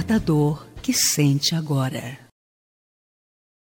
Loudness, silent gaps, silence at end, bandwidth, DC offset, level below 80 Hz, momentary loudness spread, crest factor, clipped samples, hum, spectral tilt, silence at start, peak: -21 LUFS; none; 1.55 s; 17 kHz; under 0.1%; -48 dBFS; 11 LU; 16 dB; under 0.1%; none; -4.5 dB/octave; 0 s; -6 dBFS